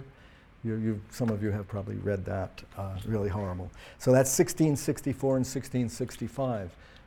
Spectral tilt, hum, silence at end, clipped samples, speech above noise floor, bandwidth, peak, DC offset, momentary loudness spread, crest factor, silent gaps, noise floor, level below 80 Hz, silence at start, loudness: -6 dB/octave; none; 0.05 s; under 0.1%; 25 dB; 18.5 kHz; -10 dBFS; under 0.1%; 13 LU; 20 dB; none; -55 dBFS; -54 dBFS; 0 s; -30 LUFS